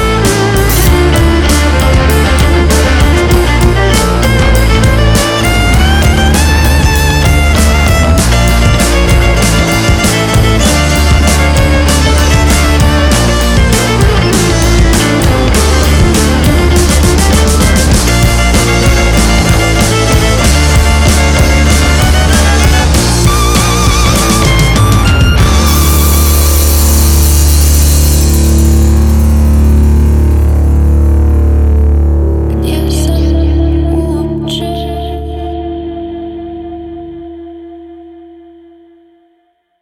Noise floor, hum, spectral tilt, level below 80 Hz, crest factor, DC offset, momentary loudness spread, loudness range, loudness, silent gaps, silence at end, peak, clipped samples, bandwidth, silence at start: -56 dBFS; none; -4.5 dB/octave; -10 dBFS; 8 dB; under 0.1%; 5 LU; 6 LU; -8 LUFS; none; 1.55 s; 0 dBFS; under 0.1%; 18 kHz; 0 s